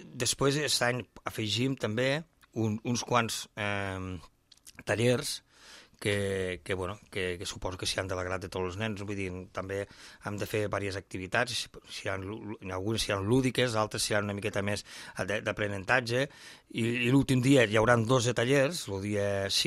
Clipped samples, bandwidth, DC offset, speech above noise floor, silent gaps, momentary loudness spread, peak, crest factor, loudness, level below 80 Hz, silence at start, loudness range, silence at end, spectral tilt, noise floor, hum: under 0.1%; 15.5 kHz; under 0.1%; 24 dB; none; 13 LU; -10 dBFS; 22 dB; -30 LUFS; -56 dBFS; 0 s; 8 LU; 0 s; -4.5 dB/octave; -55 dBFS; none